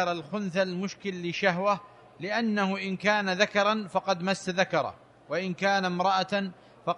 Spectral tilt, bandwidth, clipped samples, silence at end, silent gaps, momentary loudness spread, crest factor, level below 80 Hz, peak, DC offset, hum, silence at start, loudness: -5 dB/octave; 11 kHz; under 0.1%; 0 s; none; 8 LU; 20 dB; -72 dBFS; -8 dBFS; under 0.1%; none; 0 s; -28 LUFS